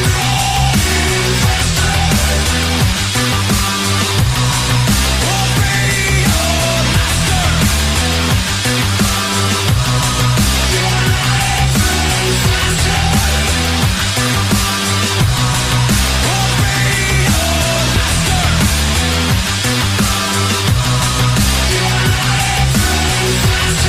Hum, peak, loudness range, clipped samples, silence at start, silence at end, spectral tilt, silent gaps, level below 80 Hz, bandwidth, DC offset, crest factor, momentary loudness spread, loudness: none; 0 dBFS; 1 LU; under 0.1%; 0 s; 0 s; -3.5 dB/octave; none; -22 dBFS; 15.5 kHz; under 0.1%; 12 dB; 1 LU; -13 LUFS